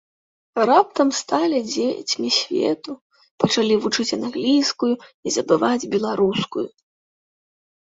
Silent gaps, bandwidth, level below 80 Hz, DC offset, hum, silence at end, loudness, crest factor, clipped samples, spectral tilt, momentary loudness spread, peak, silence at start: 3.01-3.10 s, 3.31-3.38 s, 5.14-5.23 s; 8 kHz; -64 dBFS; under 0.1%; none; 1.25 s; -20 LUFS; 20 dB; under 0.1%; -4 dB/octave; 10 LU; -2 dBFS; 0.55 s